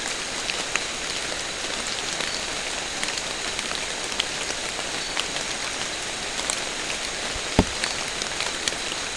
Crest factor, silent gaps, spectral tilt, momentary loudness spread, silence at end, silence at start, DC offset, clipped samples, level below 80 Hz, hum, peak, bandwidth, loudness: 28 dB; none; -1.5 dB/octave; 3 LU; 0 s; 0 s; 0.2%; under 0.1%; -44 dBFS; none; 0 dBFS; 12 kHz; -26 LUFS